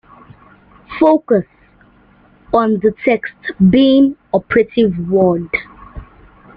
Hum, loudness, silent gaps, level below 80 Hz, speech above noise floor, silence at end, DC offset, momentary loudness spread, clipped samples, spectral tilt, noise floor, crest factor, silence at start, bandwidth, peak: none; -14 LUFS; none; -44 dBFS; 36 dB; 0.5 s; under 0.1%; 11 LU; under 0.1%; -9.5 dB/octave; -48 dBFS; 16 dB; 0.9 s; 5.2 kHz; 0 dBFS